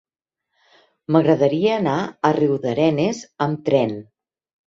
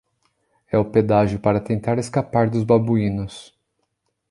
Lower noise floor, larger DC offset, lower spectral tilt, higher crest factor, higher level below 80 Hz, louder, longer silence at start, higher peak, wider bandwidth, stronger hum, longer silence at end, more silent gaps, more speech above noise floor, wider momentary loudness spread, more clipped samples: first, -81 dBFS vs -73 dBFS; neither; about the same, -7 dB/octave vs -8 dB/octave; about the same, 18 dB vs 18 dB; second, -62 dBFS vs -48 dBFS; about the same, -19 LUFS vs -20 LUFS; first, 1.1 s vs 0.7 s; about the same, -2 dBFS vs -2 dBFS; second, 7.8 kHz vs 11.5 kHz; neither; second, 0.65 s vs 0.9 s; neither; first, 62 dB vs 54 dB; about the same, 8 LU vs 8 LU; neither